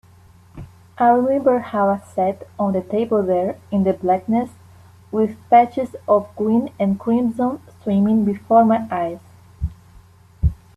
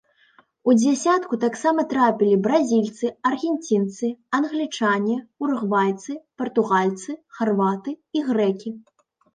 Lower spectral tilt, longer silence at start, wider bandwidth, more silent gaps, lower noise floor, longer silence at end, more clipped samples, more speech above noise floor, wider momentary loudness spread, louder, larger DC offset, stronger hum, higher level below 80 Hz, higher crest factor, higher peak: first, -9 dB/octave vs -5.5 dB/octave; about the same, 0.55 s vs 0.65 s; first, 12 kHz vs 9.6 kHz; neither; second, -48 dBFS vs -58 dBFS; second, 0.25 s vs 0.55 s; neither; second, 30 dB vs 37 dB; about the same, 12 LU vs 11 LU; first, -19 LUFS vs -22 LUFS; neither; neither; first, -38 dBFS vs -72 dBFS; about the same, 18 dB vs 16 dB; first, -2 dBFS vs -6 dBFS